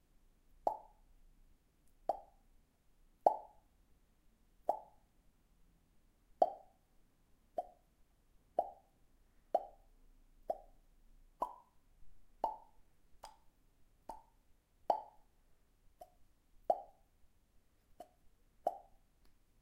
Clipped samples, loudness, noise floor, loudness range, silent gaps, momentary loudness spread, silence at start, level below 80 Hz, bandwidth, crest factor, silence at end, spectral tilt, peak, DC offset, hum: under 0.1%; -41 LUFS; -70 dBFS; 6 LU; none; 24 LU; 0.65 s; -70 dBFS; 16 kHz; 32 dB; 0.3 s; -5.5 dB/octave; -14 dBFS; under 0.1%; none